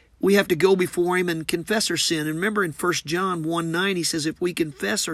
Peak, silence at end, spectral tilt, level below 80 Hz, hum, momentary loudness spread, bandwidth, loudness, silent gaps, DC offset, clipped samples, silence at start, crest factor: -4 dBFS; 0 s; -4 dB/octave; -58 dBFS; none; 6 LU; 15 kHz; -22 LUFS; none; under 0.1%; under 0.1%; 0.2 s; 18 dB